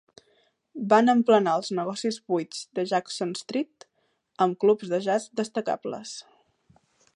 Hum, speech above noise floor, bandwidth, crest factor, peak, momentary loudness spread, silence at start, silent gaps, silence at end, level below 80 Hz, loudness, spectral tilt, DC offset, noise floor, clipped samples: none; 47 dB; 11 kHz; 20 dB; -6 dBFS; 16 LU; 0.75 s; none; 0.95 s; -78 dBFS; -25 LUFS; -5 dB/octave; under 0.1%; -72 dBFS; under 0.1%